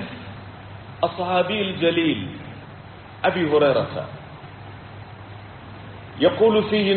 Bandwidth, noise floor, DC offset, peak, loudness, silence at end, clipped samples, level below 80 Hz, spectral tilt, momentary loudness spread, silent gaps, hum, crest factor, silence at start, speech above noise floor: 4.5 kHz; -40 dBFS; under 0.1%; -4 dBFS; -21 LUFS; 0 s; under 0.1%; -54 dBFS; -4 dB/octave; 22 LU; none; none; 18 dB; 0 s; 21 dB